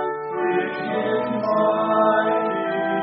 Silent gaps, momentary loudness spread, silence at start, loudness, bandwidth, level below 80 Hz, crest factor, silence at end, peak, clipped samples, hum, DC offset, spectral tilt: none; 6 LU; 0 s; -21 LUFS; 5.4 kHz; -66 dBFS; 16 dB; 0 s; -6 dBFS; under 0.1%; none; under 0.1%; -4 dB/octave